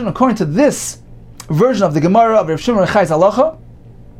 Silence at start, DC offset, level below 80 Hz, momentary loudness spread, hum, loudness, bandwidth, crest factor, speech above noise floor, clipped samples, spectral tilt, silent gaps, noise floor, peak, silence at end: 0 s; under 0.1%; -42 dBFS; 6 LU; none; -13 LUFS; 16 kHz; 12 dB; 24 dB; under 0.1%; -6 dB/octave; none; -37 dBFS; -2 dBFS; 0.25 s